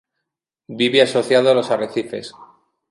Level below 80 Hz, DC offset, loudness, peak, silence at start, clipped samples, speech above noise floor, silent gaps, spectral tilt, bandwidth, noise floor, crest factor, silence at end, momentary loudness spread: -68 dBFS; under 0.1%; -17 LUFS; 0 dBFS; 0.7 s; under 0.1%; 64 dB; none; -4.5 dB/octave; 11.5 kHz; -81 dBFS; 20 dB; 0.45 s; 18 LU